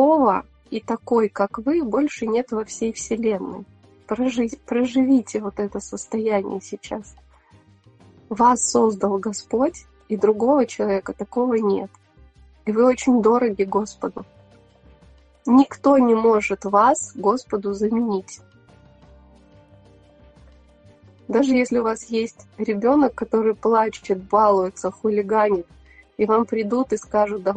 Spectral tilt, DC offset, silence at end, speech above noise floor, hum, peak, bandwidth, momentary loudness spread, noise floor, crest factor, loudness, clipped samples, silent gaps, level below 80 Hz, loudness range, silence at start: -5 dB/octave; under 0.1%; 0 s; 33 dB; none; -4 dBFS; 9.2 kHz; 13 LU; -53 dBFS; 18 dB; -21 LUFS; under 0.1%; none; -54 dBFS; 6 LU; 0 s